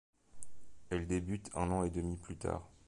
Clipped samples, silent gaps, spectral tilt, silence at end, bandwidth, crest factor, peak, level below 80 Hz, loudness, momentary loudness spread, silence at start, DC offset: under 0.1%; none; -6.5 dB/octave; 0 s; 11.5 kHz; 18 dB; -20 dBFS; -50 dBFS; -39 LUFS; 20 LU; 0.1 s; under 0.1%